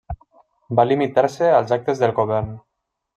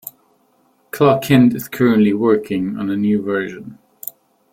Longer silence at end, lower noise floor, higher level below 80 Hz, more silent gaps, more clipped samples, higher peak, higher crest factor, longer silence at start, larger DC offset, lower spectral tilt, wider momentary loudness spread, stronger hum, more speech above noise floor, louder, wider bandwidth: second, 0.55 s vs 0.8 s; about the same, -56 dBFS vs -59 dBFS; first, -46 dBFS vs -52 dBFS; neither; neither; about the same, -2 dBFS vs -2 dBFS; about the same, 18 dB vs 16 dB; about the same, 0.1 s vs 0.05 s; neither; about the same, -7 dB/octave vs -7 dB/octave; second, 14 LU vs 18 LU; neither; second, 38 dB vs 43 dB; second, -19 LUFS vs -16 LUFS; second, 10 kHz vs 16.5 kHz